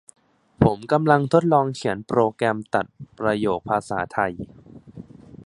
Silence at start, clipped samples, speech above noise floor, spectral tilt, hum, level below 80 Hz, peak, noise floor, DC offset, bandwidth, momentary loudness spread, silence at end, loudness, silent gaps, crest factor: 0.6 s; under 0.1%; 21 dB; -7 dB/octave; none; -50 dBFS; -2 dBFS; -43 dBFS; under 0.1%; 11.5 kHz; 10 LU; 0.1 s; -22 LUFS; none; 22 dB